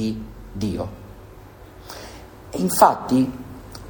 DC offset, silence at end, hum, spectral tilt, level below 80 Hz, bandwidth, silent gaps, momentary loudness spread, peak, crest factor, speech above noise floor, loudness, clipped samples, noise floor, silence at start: under 0.1%; 0 s; none; -5.5 dB/octave; -44 dBFS; over 20 kHz; none; 26 LU; 0 dBFS; 24 dB; 23 dB; -21 LUFS; under 0.1%; -43 dBFS; 0 s